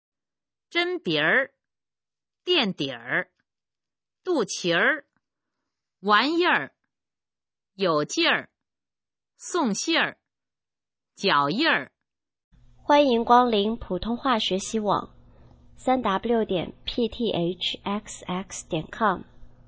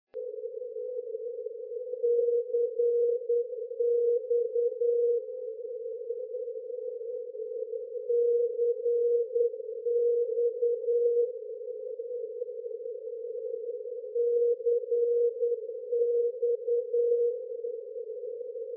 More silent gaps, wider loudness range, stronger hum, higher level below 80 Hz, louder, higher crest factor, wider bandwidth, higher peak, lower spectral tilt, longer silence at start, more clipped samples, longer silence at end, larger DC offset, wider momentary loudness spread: first, 12.44-12.51 s vs none; about the same, 5 LU vs 5 LU; neither; first, -54 dBFS vs under -90 dBFS; first, -24 LUFS vs -30 LUFS; first, 22 dB vs 12 dB; first, 8 kHz vs 0.6 kHz; first, -4 dBFS vs -18 dBFS; second, -3.5 dB/octave vs -7.5 dB/octave; first, 0.75 s vs 0.15 s; neither; first, 0.2 s vs 0 s; neither; about the same, 12 LU vs 12 LU